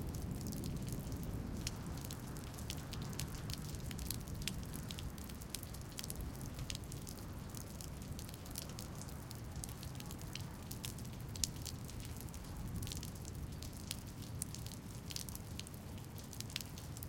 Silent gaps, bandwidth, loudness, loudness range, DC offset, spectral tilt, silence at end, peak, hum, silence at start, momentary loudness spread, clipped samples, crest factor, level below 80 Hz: none; 17 kHz; -46 LUFS; 3 LU; under 0.1%; -4 dB/octave; 0 s; -10 dBFS; none; 0 s; 5 LU; under 0.1%; 36 dB; -52 dBFS